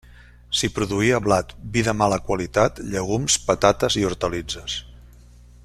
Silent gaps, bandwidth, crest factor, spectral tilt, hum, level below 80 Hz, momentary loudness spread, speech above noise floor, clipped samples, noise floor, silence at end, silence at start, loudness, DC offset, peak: none; 14.5 kHz; 22 dB; -4 dB/octave; 60 Hz at -40 dBFS; -42 dBFS; 9 LU; 25 dB; under 0.1%; -47 dBFS; 0.6 s; 0.5 s; -22 LUFS; under 0.1%; -2 dBFS